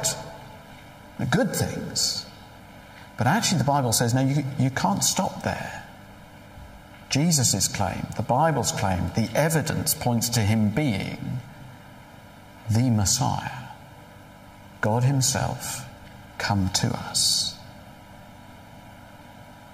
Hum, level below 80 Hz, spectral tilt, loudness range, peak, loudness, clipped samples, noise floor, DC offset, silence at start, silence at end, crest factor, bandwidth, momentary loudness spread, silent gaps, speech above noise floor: none; -52 dBFS; -4 dB/octave; 4 LU; -8 dBFS; -24 LUFS; under 0.1%; -46 dBFS; under 0.1%; 0 s; 0 s; 18 dB; 16 kHz; 23 LU; none; 23 dB